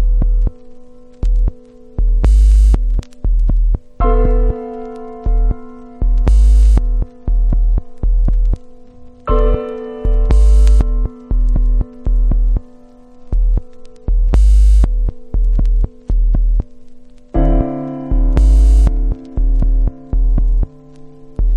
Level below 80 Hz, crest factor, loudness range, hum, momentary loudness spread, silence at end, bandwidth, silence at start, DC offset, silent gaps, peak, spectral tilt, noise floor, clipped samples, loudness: -12 dBFS; 12 dB; 3 LU; none; 12 LU; 0 s; 3.1 kHz; 0 s; under 0.1%; none; 0 dBFS; -8.5 dB/octave; -39 dBFS; under 0.1%; -17 LUFS